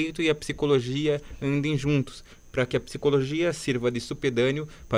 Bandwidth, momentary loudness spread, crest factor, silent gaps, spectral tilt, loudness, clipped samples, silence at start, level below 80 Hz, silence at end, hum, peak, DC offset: 13 kHz; 5 LU; 16 dB; none; -6 dB/octave; -26 LUFS; under 0.1%; 0 s; -48 dBFS; 0 s; none; -10 dBFS; under 0.1%